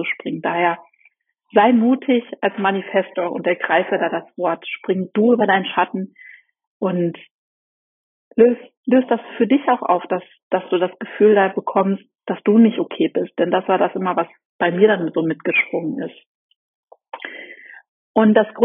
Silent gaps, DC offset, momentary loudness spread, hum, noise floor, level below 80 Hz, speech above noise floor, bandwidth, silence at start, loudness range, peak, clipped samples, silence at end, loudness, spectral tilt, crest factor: 6.67-6.80 s, 7.31-8.31 s, 8.77-8.83 s, 10.43-10.51 s, 14.45-14.59 s, 16.26-16.49 s, 16.56-16.87 s, 17.88-18.14 s; under 0.1%; 12 LU; none; -59 dBFS; -70 dBFS; 41 dB; 3.8 kHz; 0 s; 4 LU; 0 dBFS; under 0.1%; 0 s; -19 LUFS; -4.5 dB/octave; 18 dB